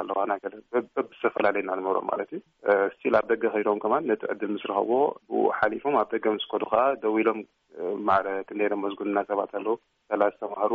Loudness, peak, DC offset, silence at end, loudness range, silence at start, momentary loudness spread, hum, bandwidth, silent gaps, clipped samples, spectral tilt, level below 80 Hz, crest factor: -27 LUFS; -10 dBFS; under 0.1%; 0 s; 2 LU; 0 s; 8 LU; none; 5 kHz; none; under 0.1%; -3 dB/octave; -70 dBFS; 18 dB